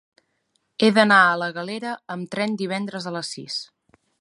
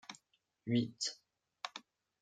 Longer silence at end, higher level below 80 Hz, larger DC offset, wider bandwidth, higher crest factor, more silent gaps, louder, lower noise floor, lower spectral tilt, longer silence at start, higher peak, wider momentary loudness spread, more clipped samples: first, 0.55 s vs 0.4 s; first, -74 dBFS vs -84 dBFS; neither; first, 11.5 kHz vs 9.4 kHz; about the same, 22 dB vs 22 dB; neither; first, -21 LUFS vs -39 LUFS; second, -71 dBFS vs -78 dBFS; about the same, -4.5 dB/octave vs -4.5 dB/octave; first, 0.8 s vs 0.1 s; first, -2 dBFS vs -20 dBFS; second, 16 LU vs 20 LU; neither